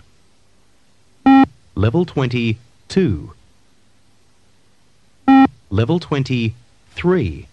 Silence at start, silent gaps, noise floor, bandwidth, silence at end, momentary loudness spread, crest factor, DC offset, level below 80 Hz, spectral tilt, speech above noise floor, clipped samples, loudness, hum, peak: 1.25 s; none; -58 dBFS; 8.6 kHz; 0.1 s; 10 LU; 16 dB; 0.3%; -44 dBFS; -8 dB/octave; 40 dB; under 0.1%; -17 LUFS; none; -2 dBFS